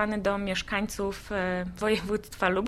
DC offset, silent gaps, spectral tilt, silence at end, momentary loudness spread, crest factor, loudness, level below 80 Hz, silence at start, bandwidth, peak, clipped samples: under 0.1%; none; -5 dB/octave; 0 s; 4 LU; 20 dB; -29 LUFS; -46 dBFS; 0 s; 15.5 kHz; -10 dBFS; under 0.1%